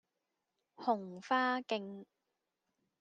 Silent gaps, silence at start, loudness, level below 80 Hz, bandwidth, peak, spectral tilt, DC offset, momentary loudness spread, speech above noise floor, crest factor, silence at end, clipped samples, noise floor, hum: none; 0.8 s; -36 LUFS; under -90 dBFS; 9 kHz; -18 dBFS; -5 dB/octave; under 0.1%; 13 LU; 51 dB; 20 dB; 0.95 s; under 0.1%; -87 dBFS; none